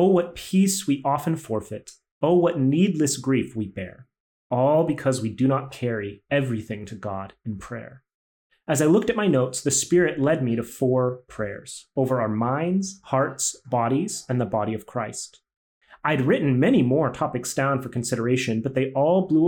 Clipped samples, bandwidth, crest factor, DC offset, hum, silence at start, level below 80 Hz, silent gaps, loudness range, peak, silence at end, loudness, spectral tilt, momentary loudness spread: under 0.1%; 19 kHz; 16 dB; under 0.1%; none; 0 s; -60 dBFS; 2.11-2.21 s, 4.20-4.50 s, 8.14-8.50 s, 15.56-15.81 s; 4 LU; -8 dBFS; 0 s; -23 LUFS; -5.5 dB/octave; 13 LU